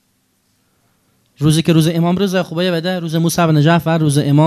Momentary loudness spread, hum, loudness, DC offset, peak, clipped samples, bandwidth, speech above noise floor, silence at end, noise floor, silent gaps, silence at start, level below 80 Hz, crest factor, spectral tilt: 5 LU; none; -15 LUFS; under 0.1%; 0 dBFS; under 0.1%; 14 kHz; 48 dB; 0 s; -62 dBFS; none; 1.4 s; -50 dBFS; 14 dB; -6 dB/octave